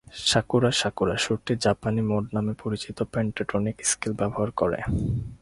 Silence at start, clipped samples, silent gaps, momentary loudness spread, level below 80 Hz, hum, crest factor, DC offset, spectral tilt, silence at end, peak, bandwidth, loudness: 0.15 s; under 0.1%; none; 7 LU; -44 dBFS; none; 20 dB; under 0.1%; -4.5 dB/octave; 0.05 s; -6 dBFS; 11.5 kHz; -26 LUFS